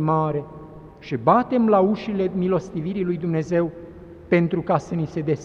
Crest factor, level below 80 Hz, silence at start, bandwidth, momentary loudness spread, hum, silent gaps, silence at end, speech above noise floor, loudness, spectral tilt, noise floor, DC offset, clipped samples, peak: 20 dB; -52 dBFS; 0 s; 7.4 kHz; 21 LU; none; none; 0 s; 20 dB; -22 LUFS; -8.5 dB/octave; -41 dBFS; under 0.1%; under 0.1%; -2 dBFS